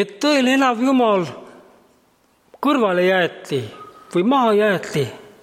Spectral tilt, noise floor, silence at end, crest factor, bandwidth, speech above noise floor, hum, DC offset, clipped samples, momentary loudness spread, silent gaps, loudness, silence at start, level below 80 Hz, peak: -5 dB/octave; -59 dBFS; 0.2 s; 16 dB; 16 kHz; 41 dB; none; under 0.1%; under 0.1%; 10 LU; none; -18 LUFS; 0 s; -68 dBFS; -4 dBFS